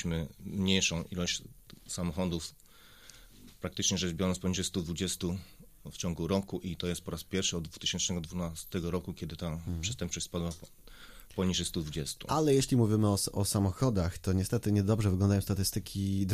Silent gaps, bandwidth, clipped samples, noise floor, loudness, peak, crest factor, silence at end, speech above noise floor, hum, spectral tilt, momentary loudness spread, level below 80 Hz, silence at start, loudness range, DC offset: none; 15.5 kHz; under 0.1%; -56 dBFS; -32 LUFS; -12 dBFS; 20 dB; 0 s; 24 dB; none; -4.5 dB/octave; 11 LU; -50 dBFS; 0 s; 7 LU; under 0.1%